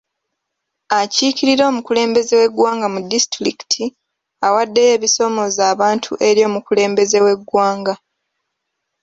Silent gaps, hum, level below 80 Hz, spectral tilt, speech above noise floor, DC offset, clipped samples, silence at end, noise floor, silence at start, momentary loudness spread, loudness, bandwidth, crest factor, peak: none; none; -62 dBFS; -2.5 dB/octave; 62 dB; under 0.1%; under 0.1%; 1.05 s; -76 dBFS; 0.9 s; 6 LU; -15 LUFS; 8 kHz; 14 dB; -2 dBFS